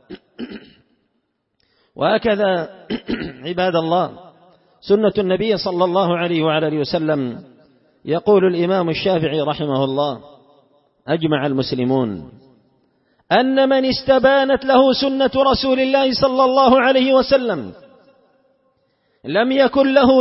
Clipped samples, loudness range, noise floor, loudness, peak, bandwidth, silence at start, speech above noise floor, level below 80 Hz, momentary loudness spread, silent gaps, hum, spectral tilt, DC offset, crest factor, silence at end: under 0.1%; 7 LU; -70 dBFS; -17 LUFS; 0 dBFS; 5.8 kHz; 0.1 s; 54 dB; -50 dBFS; 13 LU; none; none; -9 dB/octave; under 0.1%; 16 dB; 0 s